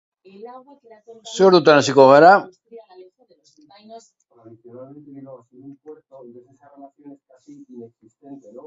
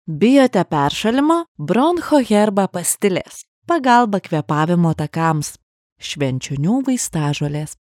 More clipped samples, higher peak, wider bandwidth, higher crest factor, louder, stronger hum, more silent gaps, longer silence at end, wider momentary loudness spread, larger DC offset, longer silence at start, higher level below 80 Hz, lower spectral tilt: neither; about the same, 0 dBFS vs 0 dBFS; second, 8 kHz vs 17 kHz; about the same, 20 dB vs 16 dB; first, -12 LUFS vs -17 LUFS; neither; second, none vs 1.48-1.55 s, 3.48-3.62 s, 5.63-5.96 s; first, 0.35 s vs 0.1 s; first, 30 LU vs 9 LU; neither; first, 0.45 s vs 0.05 s; second, -72 dBFS vs -52 dBFS; about the same, -5 dB/octave vs -5.5 dB/octave